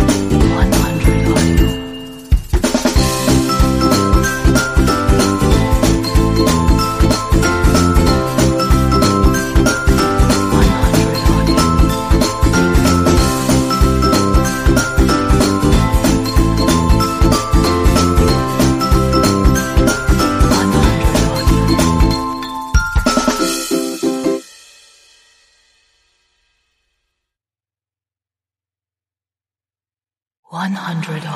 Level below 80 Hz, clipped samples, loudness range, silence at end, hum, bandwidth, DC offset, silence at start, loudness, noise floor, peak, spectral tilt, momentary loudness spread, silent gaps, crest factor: -18 dBFS; under 0.1%; 5 LU; 0 s; none; 15.5 kHz; under 0.1%; 0 s; -14 LUFS; under -90 dBFS; 0 dBFS; -5.5 dB/octave; 5 LU; 30.39-30.43 s; 14 dB